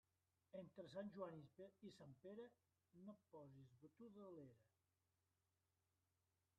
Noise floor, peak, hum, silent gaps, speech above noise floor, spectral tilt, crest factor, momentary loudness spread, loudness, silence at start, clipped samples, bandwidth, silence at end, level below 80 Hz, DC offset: under -90 dBFS; -40 dBFS; none; none; over 30 dB; -6.5 dB/octave; 22 dB; 10 LU; -61 LUFS; 0.55 s; under 0.1%; 5.6 kHz; 1.95 s; under -90 dBFS; under 0.1%